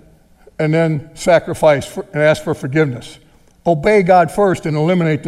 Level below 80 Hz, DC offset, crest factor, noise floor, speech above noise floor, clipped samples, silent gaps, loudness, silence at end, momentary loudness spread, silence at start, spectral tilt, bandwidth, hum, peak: -44 dBFS; under 0.1%; 14 dB; -47 dBFS; 33 dB; under 0.1%; none; -15 LUFS; 0 s; 8 LU; 0.6 s; -6.5 dB/octave; 13.5 kHz; none; 0 dBFS